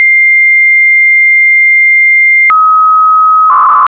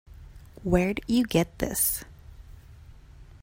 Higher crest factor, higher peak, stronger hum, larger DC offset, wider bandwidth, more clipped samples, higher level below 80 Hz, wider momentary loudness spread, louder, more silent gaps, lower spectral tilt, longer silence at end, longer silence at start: second, 4 dB vs 20 dB; first, -2 dBFS vs -8 dBFS; neither; neither; second, 4 kHz vs 16.5 kHz; neither; second, -62 dBFS vs -44 dBFS; second, 2 LU vs 11 LU; first, -3 LUFS vs -26 LUFS; neither; second, -1.5 dB/octave vs -4.5 dB/octave; second, 0.05 s vs 0.2 s; about the same, 0 s vs 0.1 s